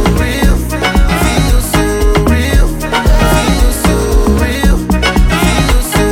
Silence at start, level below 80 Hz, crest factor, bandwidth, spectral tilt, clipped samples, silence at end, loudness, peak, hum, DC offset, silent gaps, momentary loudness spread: 0 s; -12 dBFS; 10 dB; 17 kHz; -5 dB/octave; under 0.1%; 0 s; -11 LUFS; 0 dBFS; none; under 0.1%; none; 2 LU